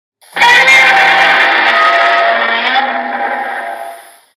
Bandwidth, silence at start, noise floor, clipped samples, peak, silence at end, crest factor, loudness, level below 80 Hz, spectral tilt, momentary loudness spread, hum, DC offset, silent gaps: 15.5 kHz; 0.35 s; -31 dBFS; under 0.1%; 0 dBFS; 0.35 s; 10 dB; -8 LUFS; -56 dBFS; -1 dB/octave; 17 LU; none; under 0.1%; none